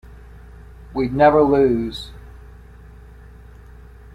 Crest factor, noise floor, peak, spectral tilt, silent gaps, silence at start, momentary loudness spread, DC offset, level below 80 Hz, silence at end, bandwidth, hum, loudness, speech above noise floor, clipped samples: 20 dB; -42 dBFS; -2 dBFS; -7.5 dB/octave; none; 0.1 s; 19 LU; under 0.1%; -40 dBFS; 1.75 s; 11.5 kHz; none; -17 LUFS; 25 dB; under 0.1%